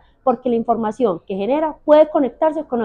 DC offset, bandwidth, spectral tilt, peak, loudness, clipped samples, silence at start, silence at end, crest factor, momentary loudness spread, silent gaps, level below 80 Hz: under 0.1%; 7.2 kHz; -7.5 dB/octave; -2 dBFS; -18 LUFS; under 0.1%; 0.25 s; 0 s; 16 dB; 8 LU; none; -52 dBFS